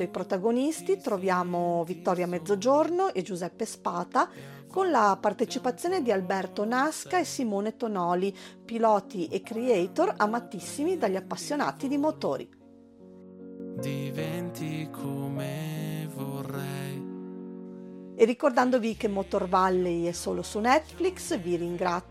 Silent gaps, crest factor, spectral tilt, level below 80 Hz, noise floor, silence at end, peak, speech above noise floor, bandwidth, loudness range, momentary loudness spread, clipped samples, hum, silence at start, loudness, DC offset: none; 20 dB; -5.5 dB/octave; -60 dBFS; -52 dBFS; 0 s; -8 dBFS; 24 dB; 15.5 kHz; 8 LU; 12 LU; under 0.1%; none; 0 s; -28 LUFS; under 0.1%